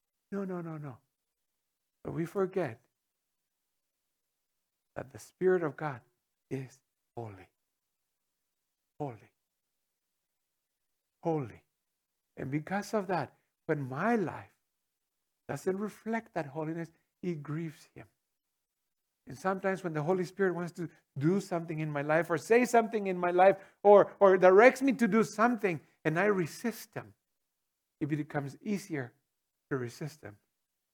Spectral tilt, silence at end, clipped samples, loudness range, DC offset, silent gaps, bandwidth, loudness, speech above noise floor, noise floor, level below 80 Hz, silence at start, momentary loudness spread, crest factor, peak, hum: -6.5 dB/octave; 0.6 s; under 0.1%; 18 LU; under 0.1%; none; 19 kHz; -30 LUFS; 56 dB; -86 dBFS; -78 dBFS; 0.3 s; 21 LU; 26 dB; -8 dBFS; none